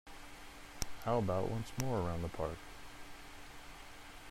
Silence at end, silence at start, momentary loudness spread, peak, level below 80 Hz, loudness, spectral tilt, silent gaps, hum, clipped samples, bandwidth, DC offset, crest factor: 0 s; 0.05 s; 17 LU; -14 dBFS; -54 dBFS; -39 LUFS; -5.5 dB/octave; none; none; under 0.1%; 16 kHz; under 0.1%; 26 dB